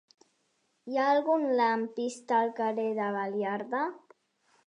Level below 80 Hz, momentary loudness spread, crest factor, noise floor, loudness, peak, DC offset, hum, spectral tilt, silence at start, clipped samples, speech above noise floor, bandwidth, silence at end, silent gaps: -88 dBFS; 9 LU; 16 dB; -75 dBFS; -29 LUFS; -14 dBFS; under 0.1%; none; -5 dB/octave; 0.85 s; under 0.1%; 46 dB; 11 kHz; 0.7 s; none